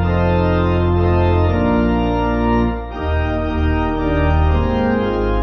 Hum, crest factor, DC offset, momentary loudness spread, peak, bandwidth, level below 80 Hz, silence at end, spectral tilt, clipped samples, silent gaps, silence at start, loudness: none; 12 dB; under 0.1%; 4 LU; -4 dBFS; 6 kHz; -20 dBFS; 0 s; -9.5 dB/octave; under 0.1%; none; 0 s; -17 LUFS